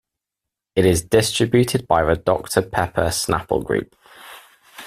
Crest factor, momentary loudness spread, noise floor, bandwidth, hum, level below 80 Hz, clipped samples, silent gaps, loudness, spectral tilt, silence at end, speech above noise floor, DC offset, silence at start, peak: 20 dB; 8 LU; -85 dBFS; 16 kHz; none; -42 dBFS; under 0.1%; none; -19 LUFS; -4.5 dB/octave; 0 s; 66 dB; under 0.1%; 0.75 s; -2 dBFS